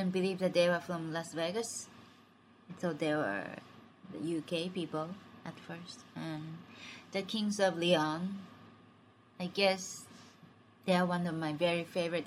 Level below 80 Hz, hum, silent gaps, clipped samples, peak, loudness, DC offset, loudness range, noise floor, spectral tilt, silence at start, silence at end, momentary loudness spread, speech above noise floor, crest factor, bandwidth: -78 dBFS; none; none; under 0.1%; -14 dBFS; -34 LUFS; under 0.1%; 6 LU; -62 dBFS; -5 dB/octave; 0 s; 0 s; 18 LU; 28 dB; 22 dB; 15 kHz